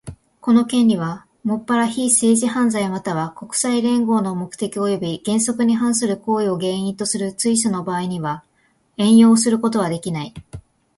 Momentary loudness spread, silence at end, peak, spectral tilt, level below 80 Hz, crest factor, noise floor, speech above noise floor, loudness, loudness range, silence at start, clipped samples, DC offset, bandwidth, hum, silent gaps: 11 LU; 0.4 s; -2 dBFS; -4.5 dB/octave; -54 dBFS; 16 dB; -61 dBFS; 43 dB; -19 LUFS; 2 LU; 0.05 s; under 0.1%; under 0.1%; 11.5 kHz; none; none